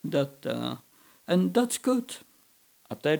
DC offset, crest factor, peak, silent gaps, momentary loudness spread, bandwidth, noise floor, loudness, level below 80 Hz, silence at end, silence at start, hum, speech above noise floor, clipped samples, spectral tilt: under 0.1%; 18 dB; -12 dBFS; none; 18 LU; over 20 kHz; -62 dBFS; -28 LUFS; -76 dBFS; 0 s; 0.05 s; none; 35 dB; under 0.1%; -5 dB/octave